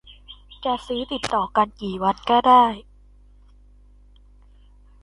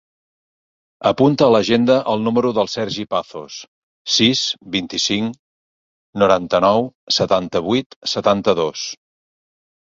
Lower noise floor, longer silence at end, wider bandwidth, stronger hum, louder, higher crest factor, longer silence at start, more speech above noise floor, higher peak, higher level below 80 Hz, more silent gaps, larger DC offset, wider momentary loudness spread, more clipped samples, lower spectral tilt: second, -50 dBFS vs under -90 dBFS; first, 2.2 s vs 0.9 s; first, 11.5 kHz vs 7.8 kHz; first, 50 Hz at -50 dBFS vs none; second, -20 LUFS vs -17 LUFS; about the same, 20 dB vs 18 dB; second, 0.3 s vs 1 s; second, 30 dB vs over 73 dB; about the same, -4 dBFS vs -2 dBFS; about the same, -50 dBFS vs -54 dBFS; second, none vs 3.68-4.05 s, 5.39-6.13 s, 6.95-7.07 s, 7.86-7.90 s, 7.96-8.01 s; neither; about the same, 12 LU vs 14 LU; neither; about the same, -5 dB/octave vs -4.5 dB/octave